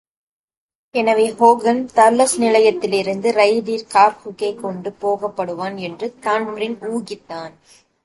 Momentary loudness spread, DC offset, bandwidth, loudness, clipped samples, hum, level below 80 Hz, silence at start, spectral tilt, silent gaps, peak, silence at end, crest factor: 13 LU; under 0.1%; 12 kHz; -17 LUFS; under 0.1%; none; -64 dBFS; 0.95 s; -4 dB/octave; none; 0 dBFS; 0.55 s; 18 dB